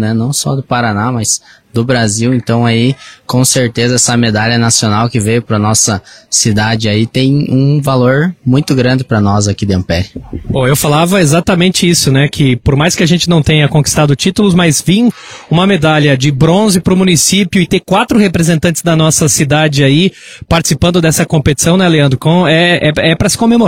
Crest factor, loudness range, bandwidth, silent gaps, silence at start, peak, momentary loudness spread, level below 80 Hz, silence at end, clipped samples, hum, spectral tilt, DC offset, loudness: 10 dB; 2 LU; 16.5 kHz; none; 0 s; 0 dBFS; 5 LU; -34 dBFS; 0 s; under 0.1%; none; -4.5 dB/octave; under 0.1%; -10 LUFS